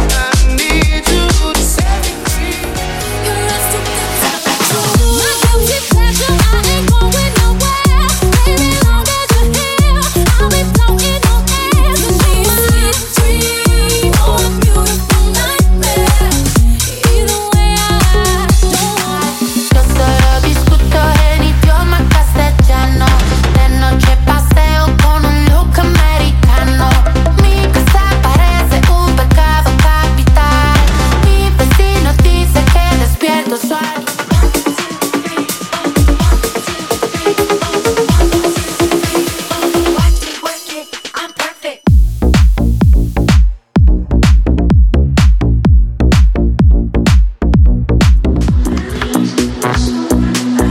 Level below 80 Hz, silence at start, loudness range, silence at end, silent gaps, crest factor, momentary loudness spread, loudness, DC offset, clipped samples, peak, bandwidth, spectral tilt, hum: -12 dBFS; 0 s; 4 LU; 0 s; none; 10 dB; 5 LU; -11 LUFS; under 0.1%; under 0.1%; 0 dBFS; 17 kHz; -4.5 dB/octave; none